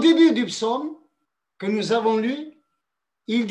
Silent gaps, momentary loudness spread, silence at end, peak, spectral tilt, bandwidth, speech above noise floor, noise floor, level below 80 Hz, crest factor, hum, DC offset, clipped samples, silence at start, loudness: none; 17 LU; 0 s; -6 dBFS; -5 dB/octave; 10 kHz; 62 dB; -82 dBFS; -74 dBFS; 16 dB; none; under 0.1%; under 0.1%; 0 s; -22 LUFS